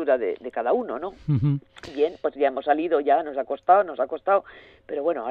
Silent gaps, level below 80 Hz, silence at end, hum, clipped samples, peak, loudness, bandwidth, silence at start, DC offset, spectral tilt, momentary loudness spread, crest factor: none; -60 dBFS; 0 s; none; under 0.1%; -6 dBFS; -24 LUFS; 6.8 kHz; 0 s; under 0.1%; -9 dB/octave; 10 LU; 18 dB